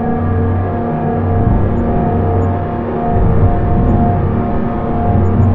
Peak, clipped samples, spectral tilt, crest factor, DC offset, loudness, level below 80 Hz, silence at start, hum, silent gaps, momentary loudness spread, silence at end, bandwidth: 0 dBFS; under 0.1%; -12 dB/octave; 12 dB; under 0.1%; -15 LUFS; -22 dBFS; 0 s; none; none; 4 LU; 0 s; 3.7 kHz